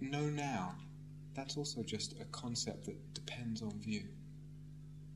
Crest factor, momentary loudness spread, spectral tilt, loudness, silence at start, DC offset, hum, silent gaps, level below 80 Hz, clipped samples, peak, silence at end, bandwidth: 20 dB; 15 LU; -4.5 dB/octave; -43 LUFS; 0 s; under 0.1%; 50 Hz at -50 dBFS; none; -66 dBFS; under 0.1%; -24 dBFS; 0 s; 12.5 kHz